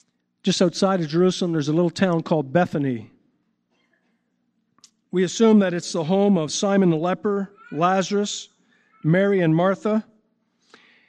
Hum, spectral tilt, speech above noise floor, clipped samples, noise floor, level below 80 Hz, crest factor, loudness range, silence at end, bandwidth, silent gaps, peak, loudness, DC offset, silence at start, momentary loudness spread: 60 Hz at -45 dBFS; -6 dB/octave; 51 dB; under 0.1%; -71 dBFS; -70 dBFS; 16 dB; 5 LU; 1.05 s; 9.6 kHz; none; -6 dBFS; -21 LUFS; under 0.1%; 0.45 s; 9 LU